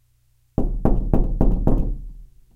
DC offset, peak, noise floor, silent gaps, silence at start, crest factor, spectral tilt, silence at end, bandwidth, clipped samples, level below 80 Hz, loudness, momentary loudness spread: under 0.1%; 0 dBFS; -61 dBFS; none; 0.6 s; 20 dB; -11.5 dB/octave; 0.3 s; 1.9 kHz; under 0.1%; -22 dBFS; -24 LUFS; 10 LU